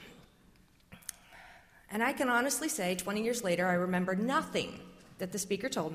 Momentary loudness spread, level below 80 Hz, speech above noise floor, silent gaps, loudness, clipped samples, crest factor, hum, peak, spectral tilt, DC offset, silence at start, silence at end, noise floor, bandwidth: 18 LU; -66 dBFS; 31 dB; none; -32 LUFS; under 0.1%; 18 dB; none; -18 dBFS; -4 dB/octave; under 0.1%; 0 s; 0 s; -63 dBFS; 16 kHz